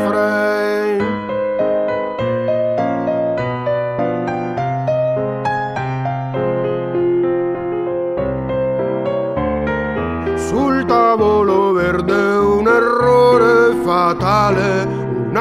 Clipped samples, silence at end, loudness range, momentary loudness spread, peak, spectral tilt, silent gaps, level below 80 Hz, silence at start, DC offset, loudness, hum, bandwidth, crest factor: under 0.1%; 0 s; 6 LU; 8 LU; -2 dBFS; -7 dB/octave; none; -40 dBFS; 0 s; under 0.1%; -16 LUFS; none; 14.5 kHz; 14 dB